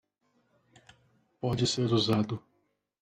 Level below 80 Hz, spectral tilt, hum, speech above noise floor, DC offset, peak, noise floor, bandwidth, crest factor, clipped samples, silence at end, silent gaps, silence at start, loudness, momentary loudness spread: -62 dBFS; -5.5 dB/octave; none; 47 dB; under 0.1%; -14 dBFS; -76 dBFS; 13.5 kHz; 18 dB; under 0.1%; 0.65 s; none; 1.45 s; -29 LUFS; 10 LU